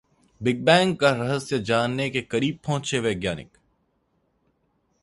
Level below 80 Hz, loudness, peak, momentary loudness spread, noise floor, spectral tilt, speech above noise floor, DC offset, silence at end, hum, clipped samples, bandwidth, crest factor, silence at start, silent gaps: -56 dBFS; -23 LUFS; -2 dBFS; 10 LU; -70 dBFS; -5 dB/octave; 47 dB; under 0.1%; 1.6 s; none; under 0.1%; 11.5 kHz; 22 dB; 0.4 s; none